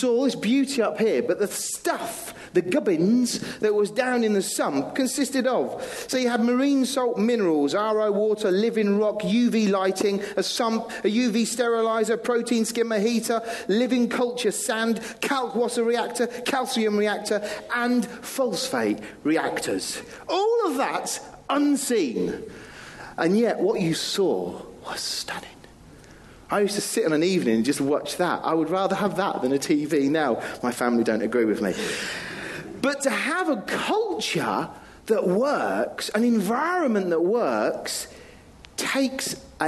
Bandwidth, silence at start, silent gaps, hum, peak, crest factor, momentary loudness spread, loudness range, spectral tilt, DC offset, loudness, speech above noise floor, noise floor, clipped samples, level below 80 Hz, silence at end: 13 kHz; 0 s; none; none; -8 dBFS; 16 dB; 8 LU; 3 LU; -4 dB/octave; under 0.1%; -24 LUFS; 24 dB; -48 dBFS; under 0.1%; -62 dBFS; 0 s